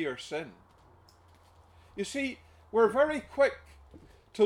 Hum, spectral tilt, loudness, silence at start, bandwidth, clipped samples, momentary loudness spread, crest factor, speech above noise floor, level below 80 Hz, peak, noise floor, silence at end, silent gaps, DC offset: none; -4.5 dB/octave; -30 LUFS; 0 s; 12.5 kHz; under 0.1%; 22 LU; 18 dB; 30 dB; -60 dBFS; -12 dBFS; -60 dBFS; 0 s; none; under 0.1%